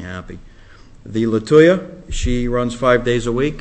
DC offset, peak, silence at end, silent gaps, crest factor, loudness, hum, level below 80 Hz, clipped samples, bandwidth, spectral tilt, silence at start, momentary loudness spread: under 0.1%; 0 dBFS; 0 s; none; 16 dB; -16 LUFS; none; -30 dBFS; under 0.1%; 8.6 kHz; -6 dB/octave; 0 s; 19 LU